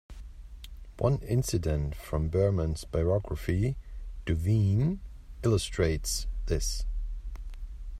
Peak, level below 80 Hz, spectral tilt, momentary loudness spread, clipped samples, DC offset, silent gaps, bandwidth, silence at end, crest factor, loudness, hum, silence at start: -12 dBFS; -38 dBFS; -6 dB/octave; 20 LU; under 0.1%; under 0.1%; none; 14.5 kHz; 0 s; 18 dB; -30 LUFS; none; 0.1 s